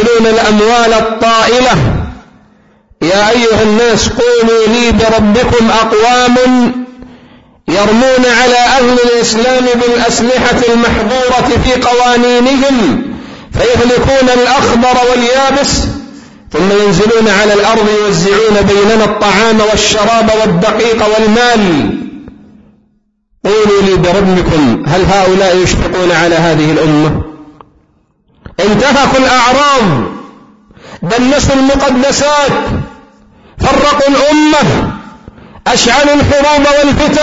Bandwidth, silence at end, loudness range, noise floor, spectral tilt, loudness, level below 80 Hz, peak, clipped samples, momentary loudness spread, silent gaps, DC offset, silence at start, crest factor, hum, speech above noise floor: 8 kHz; 0 s; 3 LU; -55 dBFS; -4.5 dB/octave; -8 LUFS; -26 dBFS; 0 dBFS; under 0.1%; 8 LU; none; under 0.1%; 0 s; 8 dB; none; 47 dB